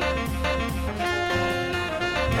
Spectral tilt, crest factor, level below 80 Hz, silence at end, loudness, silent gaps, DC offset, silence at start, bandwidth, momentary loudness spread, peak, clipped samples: -5 dB/octave; 14 dB; -34 dBFS; 0 s; -26 LUFS; none; under 0.1%; 0 s; 16 kHz; 3 LU; -12 dBFS; under 0.1%